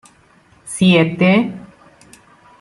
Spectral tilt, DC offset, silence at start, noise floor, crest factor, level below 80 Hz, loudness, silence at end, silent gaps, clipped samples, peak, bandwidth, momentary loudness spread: -6 dB/octave; under 0.1%; 0.65 s; -51 dBFS; 16 dB; -56 dBFS; -14 LUFS; 1 s; none; under 0.1%; -2 dBFS; 12 kHz; 17 LU